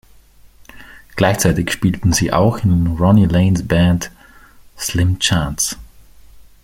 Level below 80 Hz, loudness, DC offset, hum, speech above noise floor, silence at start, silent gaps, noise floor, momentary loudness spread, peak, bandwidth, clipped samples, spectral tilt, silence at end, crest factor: -36 dBFS; -16 LUFS; under 0.1%; none; 31 dB; 0.75 s; none; -45 dBFS; 9 LU; -2 dBFS; 16.5 kHz; under 0.1%; -5 dB/octave; 0.25 s; 16 dB